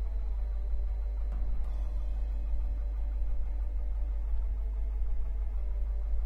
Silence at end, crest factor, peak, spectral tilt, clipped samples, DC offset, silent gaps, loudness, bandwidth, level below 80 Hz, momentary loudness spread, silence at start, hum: 0 s; 10 dB; -20 dBFS; -9 dB/octave; under 0.1%; under 0.1%; none; -37 LUFS; 2.6 kHz; -30 dBFS; 1 LU; 0 s; none